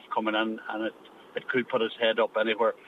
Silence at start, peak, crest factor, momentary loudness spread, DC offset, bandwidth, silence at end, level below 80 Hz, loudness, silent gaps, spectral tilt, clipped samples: 0.05 s; -12 dBFS; 16 dB; 10 LU; under 0.1%; 5.4 kHz; 0 s; -82 dBFS; -28 LUFS; none; -6 dB/octave; under 0.1%